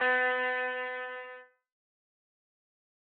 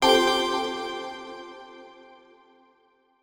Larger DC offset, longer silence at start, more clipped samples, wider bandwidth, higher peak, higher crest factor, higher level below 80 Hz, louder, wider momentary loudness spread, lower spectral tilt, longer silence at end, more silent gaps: neither; about the same, 0 s vs 0 s; neither; second, 4.6 kHz vs over 20 kHz; second, -18 dBFS vs -6 dBFS; about the same, 16 dB vs 20 dB; second, -90 dBFS vs -60 dBFS; second, -31 LUFS vs -25 LUFS; second, 19 LU vs 26 LU; second, 3 dB/octave vs -2 dB/octave; first, 1.65 s vs 1.3 s; neither